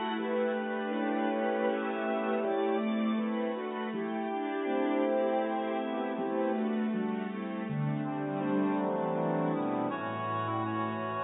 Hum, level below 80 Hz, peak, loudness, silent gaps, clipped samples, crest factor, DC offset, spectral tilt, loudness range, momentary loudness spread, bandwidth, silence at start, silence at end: none; -80 dBFS; -18 dBFS; -32 LUFS; none; under 0.1%; 12 dB; under 0.1%; -3.5 dB/octave; 1 LU; 4 LU; 3.9 kHz; 0 s; 0 s